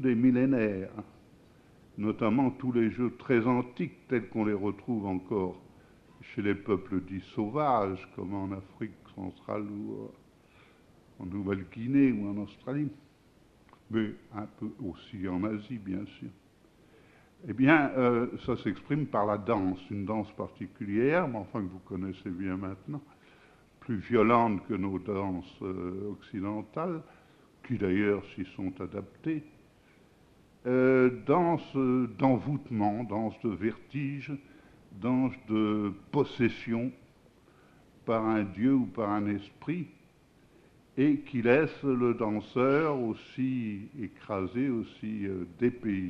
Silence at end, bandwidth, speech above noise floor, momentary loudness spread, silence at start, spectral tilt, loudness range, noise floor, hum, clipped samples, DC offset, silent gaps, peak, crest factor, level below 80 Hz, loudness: 0 s; 6.4 kHz; 31 dB; 14 LU; 0 s; -9 dB/octave; 7 LU; -61 dBFS; none; under 0.1%; under 0.1%; none; -8 dBFS; 24 dB; -64 dBFS; -31 LUFS